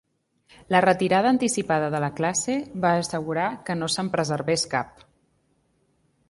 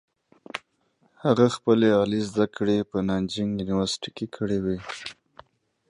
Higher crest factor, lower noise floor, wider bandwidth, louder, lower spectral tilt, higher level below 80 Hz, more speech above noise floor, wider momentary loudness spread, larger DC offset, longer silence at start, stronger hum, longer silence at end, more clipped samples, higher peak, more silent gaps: about the same, 20 dB vs 20 dB; about the same, -67 dBFS vs -67 dBFS; about the same, 11.5 kHz vs 11 kHz; about the same, -24 LUFS vs -25 LUFS; second, -4.5 dB/octave vs -6 dB/octave; second, -62 dBFS vs -54 dBFS; about the same, 44 dB vs 43 dB; second, 7 LU vs 17 LU; neither; first, 0.7 s vs 0.55 s; neither; first, 1.4 s vs 0.75 s; neither; about the same, -6 dBFS vs -6 dBFS; neither